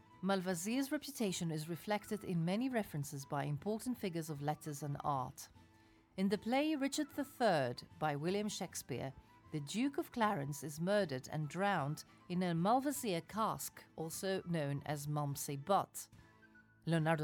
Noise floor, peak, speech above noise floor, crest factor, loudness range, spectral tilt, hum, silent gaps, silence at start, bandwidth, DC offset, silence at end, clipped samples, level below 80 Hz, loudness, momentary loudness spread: -67 dBFS; -22 dBFS; 29 dB; 18 dB; 3 LU; -5.5 dB/octave; none; none; 0.1 s; 19.5 kHz; under 0.1%; 0 s; under 0.1%; -72 dBFS; -39 LUFS; 10 LU